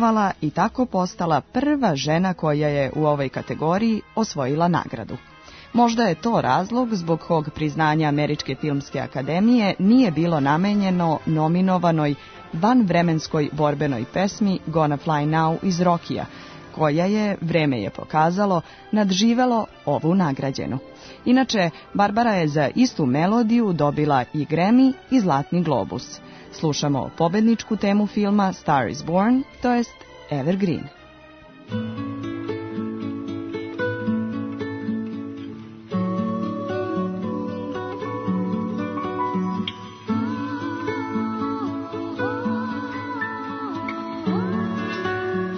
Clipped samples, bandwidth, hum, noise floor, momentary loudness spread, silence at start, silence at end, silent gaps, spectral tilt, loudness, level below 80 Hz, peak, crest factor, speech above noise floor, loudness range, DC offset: under 0.1%; 6.6 kHz; none; -46 dBFS; 11 LU; 0 s; 0 s; none; -6.5 dB/octave; -22 LUFS; -54 dBFS; -6 dBFS; 16 dB; 25 dB; 8 LU; under 0.1%